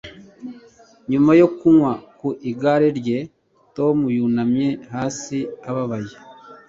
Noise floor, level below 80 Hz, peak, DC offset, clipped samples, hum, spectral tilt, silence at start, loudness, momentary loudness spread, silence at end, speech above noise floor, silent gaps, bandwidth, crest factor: -49 dBFS; -58 dBFS; -2 dBFS; under 0.1%; under 0.1%; none; -7 dB/octave; 0.05 s; -19 LUFS; 23 LU; 0.15 s; 31 dB; none; 7.8 kHz; 18 dB